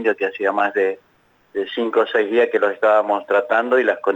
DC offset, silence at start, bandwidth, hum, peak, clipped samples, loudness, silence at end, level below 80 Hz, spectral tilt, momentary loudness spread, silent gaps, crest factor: under 0.1%; 0 s; 8 kHz; none; -6 dBFS; under 0.1%; -18 LUFS; 0 s; -72 dBFS; -5 dB/octave; 8 LU; none; 14 dB